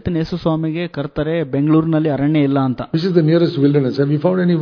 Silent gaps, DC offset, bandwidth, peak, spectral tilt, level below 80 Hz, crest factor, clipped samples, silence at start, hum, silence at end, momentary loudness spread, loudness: none; under 0.1%; 5.4 kHz; 0 dBFS; -9.5 dB/octave; -46 dBFS; 14 dB; under 0.1%; 0.05 s; none; 0 s; 6 LU; -17 LUFS